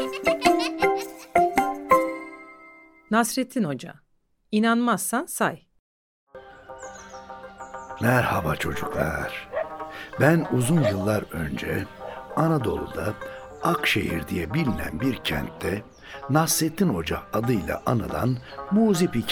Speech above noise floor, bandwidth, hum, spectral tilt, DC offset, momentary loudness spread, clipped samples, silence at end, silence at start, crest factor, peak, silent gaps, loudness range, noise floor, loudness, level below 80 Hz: 26 dB; over 20 kHz; none; -5 dB/octave; under 0.1%; 18 LU; under 0.1%; 0 s; 0 s; 20 dB; -4 dBFS; 5.79-6.27 s; 4 LU; -50 dBFS; -24 LUFS; -48 dBFS